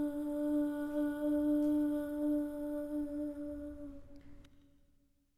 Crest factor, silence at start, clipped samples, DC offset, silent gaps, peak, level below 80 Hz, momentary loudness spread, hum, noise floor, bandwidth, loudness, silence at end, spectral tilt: 12 dB; 0 s; under 0.1%; under 0.1%; none; -24 dBFS; -60 dBFS; 14 LU; none; -71 dBFS; 14 kHz; -36 LUFS; 0.85 s; -7 dB/octave